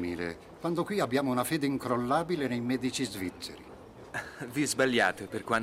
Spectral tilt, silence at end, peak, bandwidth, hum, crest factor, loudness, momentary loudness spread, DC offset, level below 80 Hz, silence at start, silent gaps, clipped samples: -4.5 dB/octave; 0 s; -12 dBFS; 16 kHz; none; 20 dB; -31 LUFS; 13 LU; under 0.1%; -62 dBFS; 0 s; none; under 0.1%